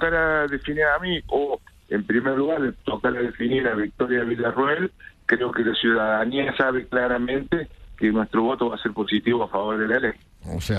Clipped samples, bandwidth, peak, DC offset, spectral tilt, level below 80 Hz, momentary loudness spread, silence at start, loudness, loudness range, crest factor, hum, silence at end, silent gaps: under 0.1%; 13 kHz; -6 dBFS; under 0.1%; -6.5 dB/octave; -46 dBFS; 7 LU; 0 s; -23 LUFS; 2 LU; 18 dB; none; 0 s; none